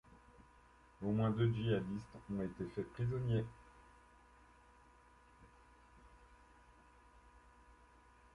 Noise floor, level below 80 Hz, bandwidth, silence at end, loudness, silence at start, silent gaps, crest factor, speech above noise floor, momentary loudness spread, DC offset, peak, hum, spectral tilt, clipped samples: -66 dBFS; -64 dBFS; 10.5 kHz; 1.05 s; -40 LUFS; 0.4 s; none; 20 dB; 28 dB; 26 LU; under 0.1%; -24 dBFS; none; -8.5 dB/octave; under 0.1%